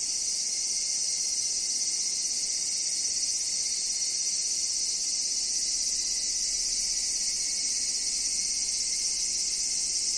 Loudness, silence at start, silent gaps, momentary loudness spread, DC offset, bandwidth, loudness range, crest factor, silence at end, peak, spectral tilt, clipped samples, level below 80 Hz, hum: -26 LUFS; 0 s; none; 1 LU; under 0.1%; 10.5 kHz; 0 LU; 14 dB; 0 s; -16 dBFS; 3 dB/octave; under 0.1%; -58 dBFS; none